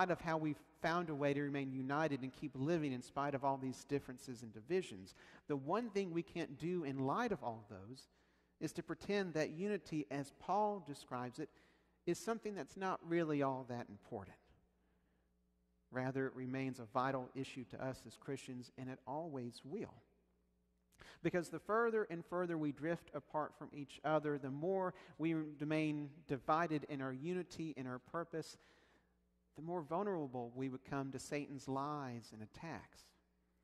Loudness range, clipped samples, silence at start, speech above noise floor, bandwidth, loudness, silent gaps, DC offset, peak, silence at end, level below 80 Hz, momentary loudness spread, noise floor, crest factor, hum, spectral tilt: 6 LU; under 0.1%; 0 s; 37 dB; 13 kHz; -43 LUFS; none; under 0.1%; -22 dBFS; 0.6 s; -76 dBFS; 13 LU; -79 dBFS; 22 dB; none; -6.5 dB/octave